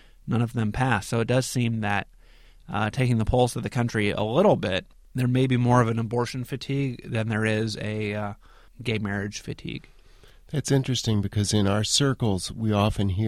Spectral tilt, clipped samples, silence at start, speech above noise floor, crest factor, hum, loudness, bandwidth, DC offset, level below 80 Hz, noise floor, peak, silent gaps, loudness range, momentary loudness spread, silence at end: -5.5 dB/octave; under 0.1%; 0.25 s; 28 dB; 18 dB; none; -25 LUFS; 15 kHz; 0.1%; -44 dBFS; -52 dBFS; -8 dBFS; none; 6 LU; 11 LU; 0 s